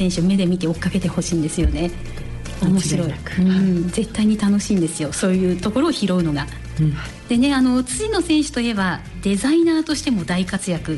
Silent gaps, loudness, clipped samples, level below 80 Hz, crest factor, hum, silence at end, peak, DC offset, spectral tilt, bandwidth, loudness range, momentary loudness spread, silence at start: none; -20 LUFS; under 0.1%; -34 dBFS; 12 dB; none; 0 s; -8 dBFS; under 0.1%; -5.5 dB/octave; 12 kHz; 2 LU; 7 LU; 0 s